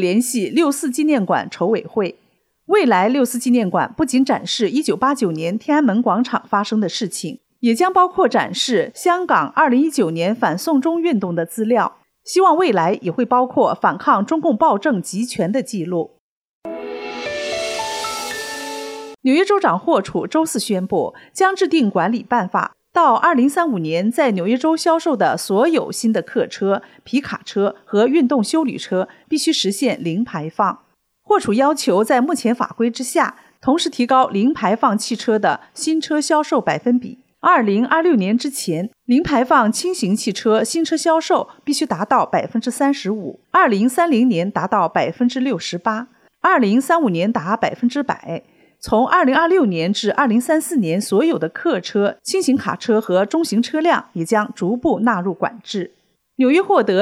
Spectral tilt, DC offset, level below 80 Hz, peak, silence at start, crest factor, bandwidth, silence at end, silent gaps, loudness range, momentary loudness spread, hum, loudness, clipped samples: -4.5 dB/octave; under 0.1%; -58 dBFS; -2 dBFS; 0 s; 14 dB; 15.5 kHz; 0 s; 16.19-16.62 s; 3 LU; 8 LU; none; -18 LUFS; under 0.1%